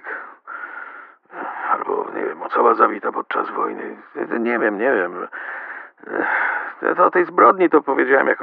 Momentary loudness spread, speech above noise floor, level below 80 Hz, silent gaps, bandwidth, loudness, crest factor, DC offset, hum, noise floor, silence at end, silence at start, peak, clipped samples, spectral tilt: 18 LU; 22 dB; -76 dBFS; none; 4.8 kHz; -19 LUFS; 18 dB; under 0.1%; none; -40 dBFS; 0 s; 0.05 s; 0 dBFS; under 0.1%; -3.5 dB/octave